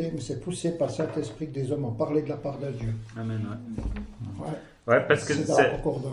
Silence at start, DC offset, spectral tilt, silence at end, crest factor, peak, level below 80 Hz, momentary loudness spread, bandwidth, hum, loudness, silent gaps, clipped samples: 0 s; under 0.1%; -6 dB/octave; 0 s; 22 dB; -6 dBFS; -46 dBFS; 14 LU; 11.5 kHz; none; -28 LUFS; none; under 0.1%